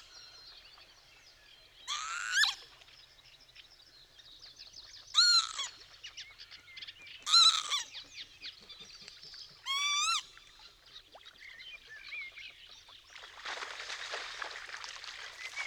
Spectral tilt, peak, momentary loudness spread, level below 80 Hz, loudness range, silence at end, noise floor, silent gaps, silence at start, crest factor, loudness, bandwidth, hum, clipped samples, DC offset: 3.5 dB/octave; -14 dBFS; 27 LU; -72 dBFS; 14 LU; 0 s; -60 dBFS; none; 0 s; 24 dB; -30 LUFS; over 20 kHz; none; under 0.1%; under 0.1%